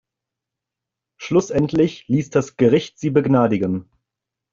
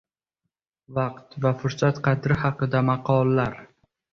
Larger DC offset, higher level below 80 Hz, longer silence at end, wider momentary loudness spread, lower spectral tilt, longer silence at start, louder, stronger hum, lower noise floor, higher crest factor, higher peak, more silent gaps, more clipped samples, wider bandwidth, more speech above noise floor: neither; about the same, -54 dBFS vs -52 dBFS; first, 0.7 s vs 0.5 s; second, 6 LU vs 9 LU; about the same, -7 dB/octave vs -8 dB/octave; first, 1.2 s vs 0.9 s; first, -19 LUFS vs -24 LUFS; neither; about the same, -85 dBFS vs -83 dBFS; about the same, 18 dB vs 18 dB; first, -2 dBFS vs -6 dBFS; neither; neither; first, 7.6 kHz vs 6.8 kHz; first, 67 dB vs 60 dB